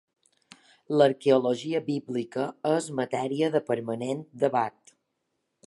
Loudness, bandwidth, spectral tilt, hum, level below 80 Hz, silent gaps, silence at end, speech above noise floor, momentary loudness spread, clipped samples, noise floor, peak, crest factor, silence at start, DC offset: -27 LUFS; 11.5 kHz; -6 dB/octave; none; -78 dBFS; none; 1 s; 53 dB; 9 LU; under 0.1%; -79 dBFS; -6 dBFS; 20 dB; 0.9 s; under 0.1%